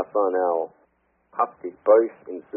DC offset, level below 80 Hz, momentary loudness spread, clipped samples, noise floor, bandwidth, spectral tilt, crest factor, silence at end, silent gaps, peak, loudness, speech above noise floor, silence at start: under 0.1%; -76 dBFS; 17 LU; under 0.1%; -63 dBFS; 2.8 kHz; 1 dB/octave; 20 dB; 0 s; none; -4 dBFS; -23 LUFS; 41 dB; 0 s